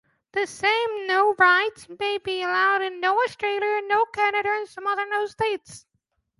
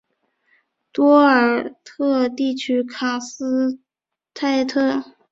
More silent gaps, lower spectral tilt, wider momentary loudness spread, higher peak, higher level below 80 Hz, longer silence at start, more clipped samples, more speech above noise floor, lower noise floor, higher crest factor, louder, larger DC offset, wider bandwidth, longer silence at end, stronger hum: neither; about the same, -2.5 dB/octave vs -3.5 dB/octave; second, 10 LU vs 13 LU; about the same, -4 dBFS vs -2 dBFS; about the same, -66 dBFS vs -66 dBFS; second, 0.35 s vs 0.95 s; neither; second, 50 dB vs 67 dB; second, -74 dBFS vs -86 dBFS; about the same, 20 dB vs 18 dB; second, -23 LUFS vs -19 LUFS; neither; first, 11.5 kHz vs 7.8 kHz; first, 0.6 s vs 0.3 s; neither